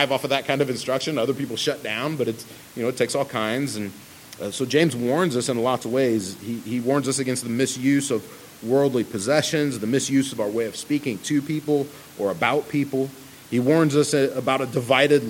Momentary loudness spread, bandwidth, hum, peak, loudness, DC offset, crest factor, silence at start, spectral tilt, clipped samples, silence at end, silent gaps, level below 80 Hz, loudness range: 9 LU; 17 kHz; none; -2 dBFS; -23 LUFS; under 0.1%; 20 dB; 0 s; -4.5 dB/octave; under 0.1%; 0 s; none; -66 dBFS; 3 LU